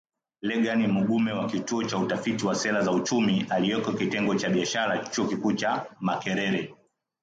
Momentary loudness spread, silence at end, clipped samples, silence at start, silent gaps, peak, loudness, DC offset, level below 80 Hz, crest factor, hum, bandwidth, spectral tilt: 5 LU; 0.5 s; under 0.1%; 0.45 s; none; -12 dBFS; -26 LUFS; under 0.1%; -66 dBFS; 14 dB; none; 9 kHz; -5 dB/octave